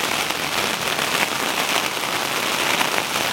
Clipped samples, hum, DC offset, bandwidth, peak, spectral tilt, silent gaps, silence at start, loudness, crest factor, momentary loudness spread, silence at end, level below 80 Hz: under 0.1%; none; under 0.1%; 17 kHz; 0 dBFS; -1 dB/octave; none; 0 s; -20 LUFS; 22 dB; 2 LU; 0 s; -58 dBFS